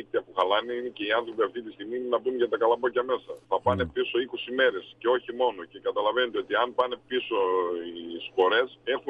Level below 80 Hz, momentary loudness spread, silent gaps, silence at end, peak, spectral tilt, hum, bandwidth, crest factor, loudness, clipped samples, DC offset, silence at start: -66 dBFS; 8 LU; none; 0 s; -10 dBFS; -6.5 dB/octave; none; 5 kHz; 18 dB; -27 LUFS; under 0.1%; under 0.1%; 0 s